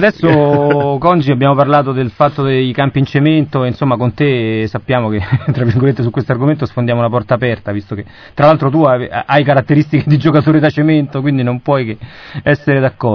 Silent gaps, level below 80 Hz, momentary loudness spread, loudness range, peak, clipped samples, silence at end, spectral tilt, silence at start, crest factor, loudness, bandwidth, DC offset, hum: none; -44 dBFS; 6 LU; 3 LU; 0 dBFS; 0.3%; 0 s; -9.5 dB/octave; 0 s; 12 dB; -13 LUFS; 5.4 kHz; 0.1%; none